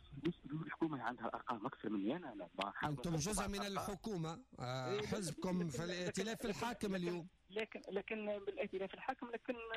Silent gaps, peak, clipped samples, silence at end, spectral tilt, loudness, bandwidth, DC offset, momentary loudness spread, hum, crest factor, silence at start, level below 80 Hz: none; -30 dBFS; under 0.1%; 0 s; -5 dB/octave; -43 LUFS; 15.5 kHz; under 0.1%; 5 LU; none; 14 dB; 0 s; -64 dBFS